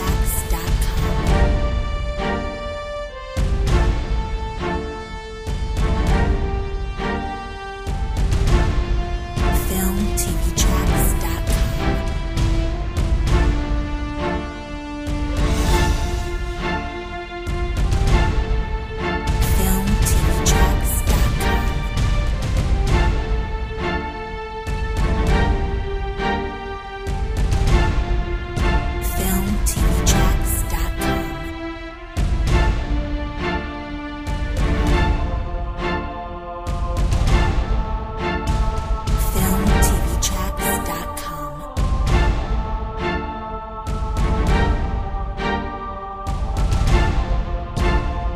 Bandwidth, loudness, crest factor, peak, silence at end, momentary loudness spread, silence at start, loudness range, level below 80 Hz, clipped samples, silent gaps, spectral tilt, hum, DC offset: 16 kHz; -22 LUFS; 16 dB; -2 dBFS; 0 s; 10 LU; 0 s; 4 LU; -22 dBFS; under 0.1%; none; -5 dB/octave; none; under 0.1%